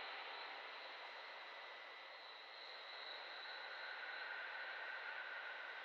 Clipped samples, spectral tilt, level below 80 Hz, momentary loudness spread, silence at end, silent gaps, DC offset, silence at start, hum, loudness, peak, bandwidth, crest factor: under 0.1%; 6 dB/octave; under -90 dBFS; 6 LU; 0 s; none; under 0.1%; 0 s; none; -50 LUFS; -38 dBFS; 7.6 kHz; 14 dB